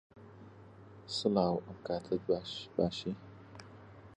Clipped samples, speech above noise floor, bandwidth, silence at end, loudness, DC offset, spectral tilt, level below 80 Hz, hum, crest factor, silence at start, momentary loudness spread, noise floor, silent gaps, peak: under 0.1%; 20 dB; 10.5 kHz; 0 s; -35 LUFS; under 0.1%; -6 dB/octave; -64 dBFS; none; 22 dB; 0.15 s; 23 LU; -55 dBFS; none; -16 dBFS